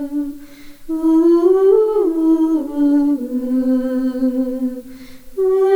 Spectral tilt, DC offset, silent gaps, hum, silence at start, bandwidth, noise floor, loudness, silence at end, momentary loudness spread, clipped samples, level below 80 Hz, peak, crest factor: -6.5 dB/octave; under 0.1%; none; none; 0 s; 17 kHz; -36 dBFS; -16 LUFS; 0 s; 13 LU; under 0.1%; -46 dBFS; -4 dBFS; 12 dB